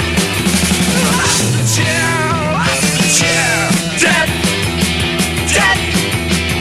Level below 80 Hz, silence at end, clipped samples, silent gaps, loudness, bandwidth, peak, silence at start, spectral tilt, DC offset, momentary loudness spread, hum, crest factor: -30 dBFS; 0 s; under 0.1%; none; -12 LUFS; 15.5 kHz; 0 dBFS; 0 s; -3 dB/octave; under 0.1%; 4 LU; none; 14 dB